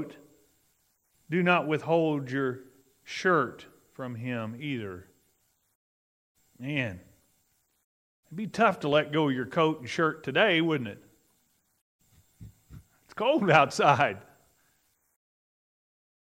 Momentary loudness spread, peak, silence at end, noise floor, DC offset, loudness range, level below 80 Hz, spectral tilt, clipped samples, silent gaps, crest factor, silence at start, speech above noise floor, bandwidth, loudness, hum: 19 LU; -4 dBFS; 2.15 s; -72 dBFS; under 0.1%; 12 LU; -70 dBFS; -5.5 dB/octave; under 0.1%; 5.75-6.35 s, 7.84-8.23 s, 11.81-11.99 s; 26 dB; 0 s; 45 dB; 16 kHz; -27 LUFS; none